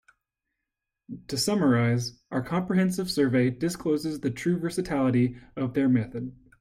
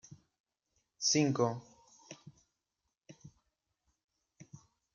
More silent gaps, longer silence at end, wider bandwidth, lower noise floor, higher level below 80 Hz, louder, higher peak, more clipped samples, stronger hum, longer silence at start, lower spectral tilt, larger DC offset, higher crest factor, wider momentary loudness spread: second, none vs 0.40-0.44 s; about the same, 0.3 s vs 0.35 s; first, 16 kHz vs 10.5 kHz; about the same, -85 dBFS vs -87 dBFS; first, -58 dBFS vs -80 dBFS; first, -26 LUFS vs -31 LUFS; first, -12 dBFS vs -16 dBFS; neither; neither; first, 1.1 s vs 0.1 s; first, -6 dB/octave vs -4 dB/octave; neither; second, 16 dB vs 24 dB; second, 10 LU vs 25 LU